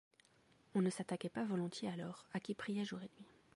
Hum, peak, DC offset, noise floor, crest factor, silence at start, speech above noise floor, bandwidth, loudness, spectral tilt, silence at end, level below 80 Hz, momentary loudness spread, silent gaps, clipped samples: none; -26 dBFS; under 0.1%; -72 dBFS; 16 dB; 0.75 s; 30 dB; 11.5 kHz; -43 LUFS; -6 dB/octave; 0.3 s; -82 dBFS; 9 LU; none; under 0.1%